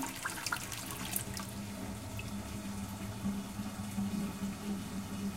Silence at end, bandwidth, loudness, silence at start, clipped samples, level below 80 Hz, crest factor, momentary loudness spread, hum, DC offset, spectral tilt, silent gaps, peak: 0 s; 17 kHz; -39 LUFS; 0 s; under 0.1%; -54 dBFS; 26 dB; 5 LU; none; under 0.1%; -4 dB/octave; none; -14 dBFS